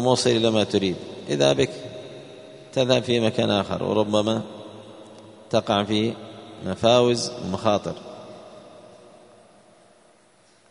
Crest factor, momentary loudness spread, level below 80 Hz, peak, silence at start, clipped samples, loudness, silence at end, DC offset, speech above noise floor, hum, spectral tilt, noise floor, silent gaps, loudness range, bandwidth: 22 dB; 22 LU; -58 dBFS; -2 dBFS; 0 s; under 0.1%; -22 LUFS; 2 s; under 0.1%; 36 dB; none; -5 dB/octave; -58 dBFS; none; 4 LU; 11 kHz